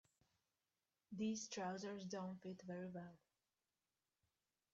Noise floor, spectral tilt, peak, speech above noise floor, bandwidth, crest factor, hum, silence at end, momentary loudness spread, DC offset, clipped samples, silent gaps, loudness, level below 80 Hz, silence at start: under -90 dBFS; -5 dB/octave; -36 dBFS; over 41 dB; 8 kHz; 16 dB; none; 1.6 s; 10 LU; under 0.1%; under 0.1%; none; -49 LUFS; -88 dBFS; 1.1 s